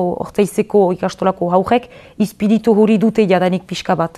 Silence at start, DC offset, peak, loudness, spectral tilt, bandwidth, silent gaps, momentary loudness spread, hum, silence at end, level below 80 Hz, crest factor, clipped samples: 0 s; under 0.1%; 0 dBFS; -15 LUFS; -6.5 dB/octave; 13.5 kHz; none; 7 LU; none; 0.1 s; -50 dBFS; 14 dB; under 0.1%